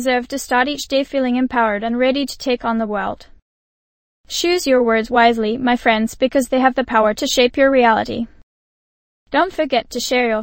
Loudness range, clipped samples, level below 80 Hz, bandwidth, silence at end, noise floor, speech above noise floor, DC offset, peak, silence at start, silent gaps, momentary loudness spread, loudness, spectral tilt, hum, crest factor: 5 LU; under 0.1%; -46 dBFS; 16.5 kHz; 0 s; under -90 dBFS; over 73 dB; under 0.1%; 0 dBFS; 0 s; 3.42-4.24 s, 8.43-9.26 s; 7 LU; -17 LUFS; -3.5 dB/octave; none; 16 dB